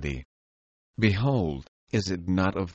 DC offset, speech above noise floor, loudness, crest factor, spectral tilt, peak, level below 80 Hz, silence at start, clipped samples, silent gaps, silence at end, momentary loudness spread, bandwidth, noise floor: under 0.1%; over 64 dB; -27 LUFS; 20 dB; -6.5 dB/octave; -8 dBFS; -46 dBFS; 0 s; under 0.1%; 0.25-0.94 s, 1.68-1.87 s; 0 s; 15 LU; 8 kHz; under -90 dBFS